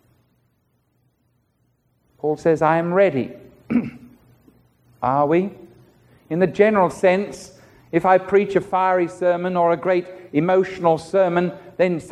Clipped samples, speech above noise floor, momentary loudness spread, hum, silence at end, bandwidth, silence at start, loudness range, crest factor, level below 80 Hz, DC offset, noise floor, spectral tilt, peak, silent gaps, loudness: under 0.1%; 47 dB; 10 LU; none; 0 s; 11.5 kHz; 2.25 s; 4 LU; 18 dB; -58 dBFS; under 0.1%; -66 dBFS; -7 dB/octave; -2 dBFS; none; -19 LUFS